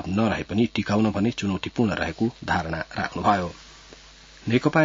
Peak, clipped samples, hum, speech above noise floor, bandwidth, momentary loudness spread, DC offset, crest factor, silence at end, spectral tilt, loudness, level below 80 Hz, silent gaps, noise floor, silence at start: -6 dBFS; under 0.1%; none; 25 dB; 7.8 kHz; 7 LU; under 0.1%; 18 dB; 0 s; -6.5 dB/octave; -25 LUFS; -50 dBFS; none; -48 dBFS; 0 s